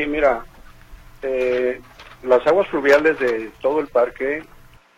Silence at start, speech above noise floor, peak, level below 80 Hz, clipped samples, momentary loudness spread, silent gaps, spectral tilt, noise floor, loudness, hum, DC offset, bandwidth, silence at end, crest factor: 0 s; 24 dB; -2 dBFS; -46 dBFS; under 0.1%; 13 LU; none; -5 dB/octave; -42 dBFS; -19 LUFS; none; under 0.1%; 15 kHz; 0.55 s; 18 dB